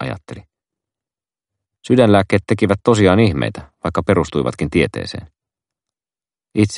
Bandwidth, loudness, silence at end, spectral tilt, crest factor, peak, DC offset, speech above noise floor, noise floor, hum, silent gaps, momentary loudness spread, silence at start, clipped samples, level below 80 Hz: 11.5 kHz; -16 LUFS; 0 s; -6.5 dB/octave; 18 dB; 0 dBFS; under 0.1%; over 74 dB; under -90 dBFS; none; none; 15 LU; 0 s; under 0.1%; -44 dBFS